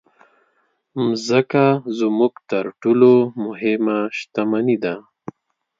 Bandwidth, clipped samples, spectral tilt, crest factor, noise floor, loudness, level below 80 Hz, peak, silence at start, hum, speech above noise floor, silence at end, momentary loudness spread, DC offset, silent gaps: 7.6 kHz; under 0.1%; -6.5 dB/octave; 18 dB; -66 dBFS; -18 LUFS; -70 dBFS; 0 dBFS; 0.95 s; none; 48 dB; 0.8 s; 15 LU; under 0.1%; none